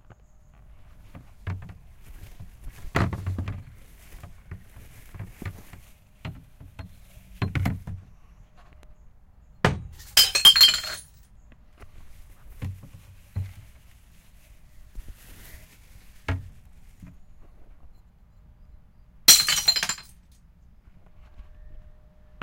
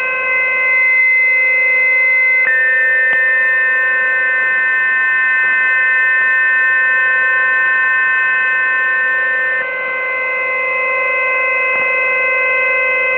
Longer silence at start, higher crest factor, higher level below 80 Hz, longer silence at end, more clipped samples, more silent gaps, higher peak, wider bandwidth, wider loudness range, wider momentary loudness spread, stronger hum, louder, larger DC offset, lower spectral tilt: first, 1.05 s vs 0 s; first, 28 dB vs 10 dB; first, -46 dBFS vs -62 dBFS; first, 0.65 s vs 0 s; neither; neither; first, 0 dBFS vs -4 dBFS; first, 16.5 kHz vs 4 kHz; first, 23 LU vs 4 LU; first, 31 LU vs 5 LU; neither; second, -19 LUFS vs -11 LUFS; neither; second, -1.5 dB/octave vs -3.5 dB/octave